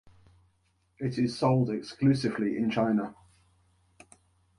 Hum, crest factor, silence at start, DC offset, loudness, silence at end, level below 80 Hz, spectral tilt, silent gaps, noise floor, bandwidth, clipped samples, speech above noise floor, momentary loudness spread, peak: none; 18 dB; 1 s; under 0.1%; -28 LUFS; 1.45 s; -64 dBFS; -7.5 dB/octave; none; -71 dBFS; 11 kHz; under 0.1%; 44 dB; 8 LU; -12 dBFS